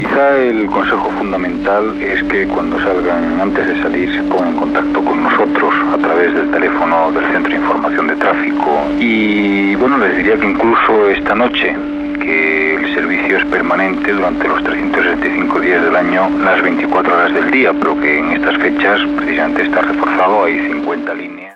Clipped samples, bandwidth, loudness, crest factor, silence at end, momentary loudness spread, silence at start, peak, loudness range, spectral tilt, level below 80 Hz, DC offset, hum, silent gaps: under 0.1%; 6.8 kHz; -13 LUFS; 12 dB; 0.05 s; 4 LU; 0 s; -2 dBFS; 2 LU; -6.5 dB/octave; -42 dBFS; under 0.1%; none; none